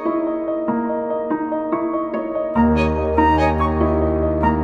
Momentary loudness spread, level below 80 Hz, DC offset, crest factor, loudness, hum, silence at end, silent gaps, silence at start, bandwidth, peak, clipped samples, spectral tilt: 6 LU; -30 dBFS; under 0.1%; 16 dB; -19 LUFS; none; 0 s; none; 0 s; 7.2 kHz; -2 dBFS; under 0.1%; -9 dB/octave